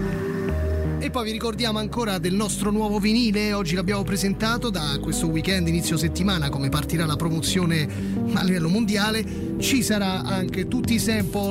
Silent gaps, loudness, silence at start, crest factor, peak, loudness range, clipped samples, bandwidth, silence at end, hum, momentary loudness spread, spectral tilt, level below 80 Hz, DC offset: none; -23 LUFS; 0 s; 12 dB; -10 dBFS; 1 LU; under 0.1%; 16 kHz; 0 s; none; 4 LU; -5 dB/octave; -36 dBFS; under 0.1%